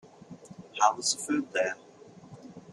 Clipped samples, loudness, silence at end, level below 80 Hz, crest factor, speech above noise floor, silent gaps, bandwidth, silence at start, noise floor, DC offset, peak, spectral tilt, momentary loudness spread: under 0.1%; -28 LUFS; 0 s; -76 dBFS; 24 dB; 22 dB; none; 13.5 kHz; 0.2 s; -51 dBFS; under 0.1%; -8 dBFS; -2 dB/octave; 24 LU